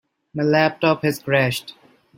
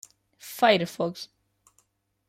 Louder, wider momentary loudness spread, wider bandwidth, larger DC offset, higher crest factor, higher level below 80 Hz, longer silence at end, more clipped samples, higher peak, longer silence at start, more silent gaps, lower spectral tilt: first, -20 LUFS vs -24 LUFS; second, 9 LU vs 22 LU; about the same, 16.5 kHz vs 16 kHz; neither; about the same, 18 dB vs 22 dB; first, -60 dBFS vs -72 dBFS; second, 0.45 s vs 1.05 s; neither; first, -2 dBFS vs -8 dBFS; about the same, 0.35 s vs 0.45 s; neither; about the same, -5.5 dB/octave vs -4.5 dB/octave